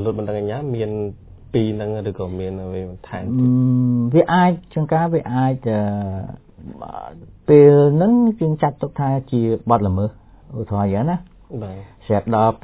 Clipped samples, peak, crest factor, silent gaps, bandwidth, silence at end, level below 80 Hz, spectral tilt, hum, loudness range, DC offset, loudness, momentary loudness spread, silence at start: under 0.1%; 0 dBFS; 18 dB; none; 4 kHz; 0.05 s; -42 dBFS; -12.5 dB/octave; none; 6 LU; under 0.1%; -18 LUFS; 18 LU; 0 s